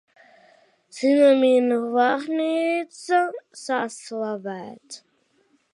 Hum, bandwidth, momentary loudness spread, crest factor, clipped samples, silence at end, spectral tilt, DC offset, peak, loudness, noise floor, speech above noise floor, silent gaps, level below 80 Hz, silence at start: none; 11.5 kHz; 21 LU; 16 dB; under 0.1%; 0.75 s; -4 dB/octave; under 0.1%; -6 dBFS; -22 LUFS; -65 dBFS; 43 dB; none; -82 dBFS; 0.95 s